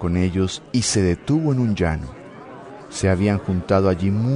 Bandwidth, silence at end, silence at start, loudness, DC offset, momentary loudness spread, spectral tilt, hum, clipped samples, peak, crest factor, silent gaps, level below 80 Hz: 10.5 kHz; 0 s; 0 s; -20 LUFS; under 0.1%; 20 LU; -6 dB/octave; none; under 0.1%; -4 dBFS; 16 dB; none; -42 dBFS